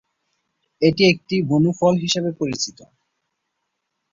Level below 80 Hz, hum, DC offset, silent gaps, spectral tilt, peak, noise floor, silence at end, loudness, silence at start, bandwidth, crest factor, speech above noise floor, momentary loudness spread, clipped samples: -58 dBFS; none; under 0.1%; none; -5 dB/octave; -2 dBFS; -76 dBFS; 1.4 s; -19 LUFS; 0.8 s; 7.8 kHz; 18 dB; 58 dB; 8 LU; under 0.1%